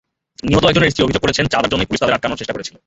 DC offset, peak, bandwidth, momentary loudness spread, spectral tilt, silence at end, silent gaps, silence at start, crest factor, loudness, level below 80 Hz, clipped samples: under 0.1%; 0 dBFS; 8.2 kHz; 10 LU; -5 dB/octave; 0.2 s; none; 0.45 s; 16 dB; -16 LUFS; -36 dBFS; under 0.1%